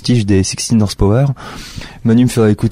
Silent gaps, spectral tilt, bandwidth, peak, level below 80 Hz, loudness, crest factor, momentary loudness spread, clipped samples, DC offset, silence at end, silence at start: none; -6 dB/octave; 15.5 kHz; -2 dBFS; -30 dBFS; -13 LUFS; 10 dB; 16 LU; under 0.1%; under 0.1%; 0 s; 0 s